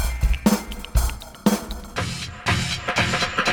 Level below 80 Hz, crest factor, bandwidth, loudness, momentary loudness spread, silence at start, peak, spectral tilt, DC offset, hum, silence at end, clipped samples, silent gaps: -28 dBFS; 18 dB; over 20 kHz; -23 LUFS; 8 LU; 0 s; -4 dBFS; -4 dB/octave; under 0.1%; none; 0 s; under 0.1%; none